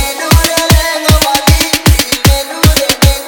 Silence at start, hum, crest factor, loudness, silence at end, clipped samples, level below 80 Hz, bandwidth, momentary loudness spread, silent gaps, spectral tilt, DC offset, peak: 0 s; none; 10 dB; -9 LUFS; 0 s; 1%; -14 dBFS; over 20 kHz; 2 LU; none; -3.5 dB/octave; under 0.1%; 0 dBFS